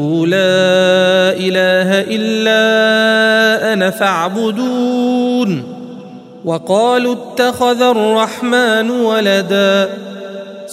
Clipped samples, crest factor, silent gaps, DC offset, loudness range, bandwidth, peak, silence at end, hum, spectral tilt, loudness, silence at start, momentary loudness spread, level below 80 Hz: under 0.1%; 12 dB; none; under 0.1%; 5 LU; 16 kHz; 0 dBFS; 0 s; none; -4.5 dB/octave; -12 LUFS; 0 s; 12 LU; -62 dBFS